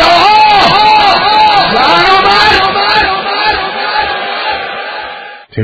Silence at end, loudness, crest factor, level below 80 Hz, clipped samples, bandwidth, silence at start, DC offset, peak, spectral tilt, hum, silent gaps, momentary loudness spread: 0 s; -7 LUFS; 8 dB; -36 dBFS; 1%; 8 kHz; 0 s; under 0.1%; 0 dBFS; -4 dB/octave; none; none; 14 LU